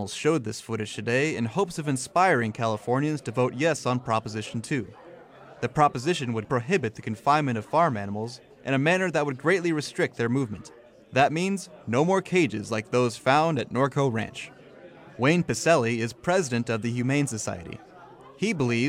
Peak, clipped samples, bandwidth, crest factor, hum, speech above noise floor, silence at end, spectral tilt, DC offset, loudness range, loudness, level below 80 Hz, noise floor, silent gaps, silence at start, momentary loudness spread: -8 dBFS; under 0.1%; 15.5 kHz; 18 dB; none; 23 dB; 0 s; -5.5 dB/octave; under 0.1%; 2 LU; -26 LUFS; -62 dBFS; -48 dBFS; none; 0 s; 10 LU